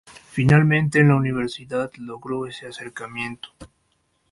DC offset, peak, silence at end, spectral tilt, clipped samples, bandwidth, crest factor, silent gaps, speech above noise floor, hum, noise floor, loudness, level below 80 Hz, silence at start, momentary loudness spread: under 0.1%; -4 dBFS; 0.65 s; -7 dB/octave; under 0.1%; 11.5 kHz; 18 dB; none; 47 dB; none; -68 dBFS; -21 LUFS; -52 dBFS; 0.35 s; 18 LU